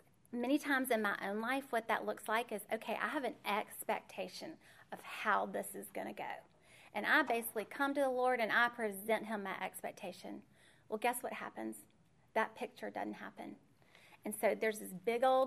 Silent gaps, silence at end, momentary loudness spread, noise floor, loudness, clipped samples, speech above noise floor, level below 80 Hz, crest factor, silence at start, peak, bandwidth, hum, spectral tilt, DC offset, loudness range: none; 0 s; 16 LU; -64 dBFS; -38 LUFS; under 0.1%; 26 dB; -84 dBFS; 22 dB; 0.3 s; -18 dBFS; 15.5 kHz; none; -3.5 dB/octave; under 0.1%; 7 LU